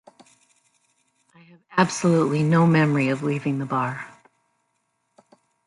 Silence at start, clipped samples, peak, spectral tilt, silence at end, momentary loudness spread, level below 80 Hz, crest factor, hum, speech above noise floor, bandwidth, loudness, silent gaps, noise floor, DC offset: 1.7 s; under 0.1%; -4 dBFS; -6.5 dB/octave; 1.6 s; 10 LU; -66 dBFS; 20 dB; none; 52 dB; 11.5 kHz; -21 LUFS; none; -73 dBFS; under 0.1%